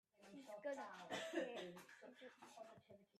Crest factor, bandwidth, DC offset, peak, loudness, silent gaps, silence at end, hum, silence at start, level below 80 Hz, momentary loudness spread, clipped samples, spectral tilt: 20 dB; 13.5 kHz; under 0.1%; -32 dBFS; -53 LUFS; none; 0 s; none; 0.2 s; under -90 dBFS; 15 LU; under 0.1%; -3.5 dB/octave